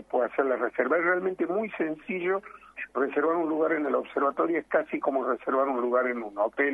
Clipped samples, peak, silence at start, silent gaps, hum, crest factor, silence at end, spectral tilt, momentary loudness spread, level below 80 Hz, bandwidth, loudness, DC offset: under 0.1%; -10 dBFS; 0.1 s; none; none; 16 dB; 0 s; -8 dB/octave; 5 LU; -70 dBFS; 3.8 kHz; -27 LUFS; under 0.1%